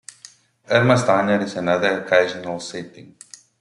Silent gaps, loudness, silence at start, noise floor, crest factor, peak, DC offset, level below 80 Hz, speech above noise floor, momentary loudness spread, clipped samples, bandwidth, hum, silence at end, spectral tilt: none; -19 LUFS; 0.7 s; -48 dBFS; 20 dB; -2 dBFS; under 0.1%; -62 dBFS; 29 dB; 17 LU; under 0.1%; 11.5 kHz; none; 0.6 s; -5.5 dB/octave